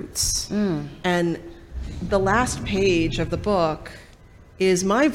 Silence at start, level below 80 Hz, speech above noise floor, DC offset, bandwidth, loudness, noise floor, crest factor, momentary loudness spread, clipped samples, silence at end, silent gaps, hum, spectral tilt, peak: 0 s; -38 dBFS; 26 dB; under 0.1%; 16.5 kHz; -22 LUFS; -47 dBFS; 16 dB; 14 LU; under 0.1%; 0 s; none; none; -4.5 dB/octave; -8 dBFS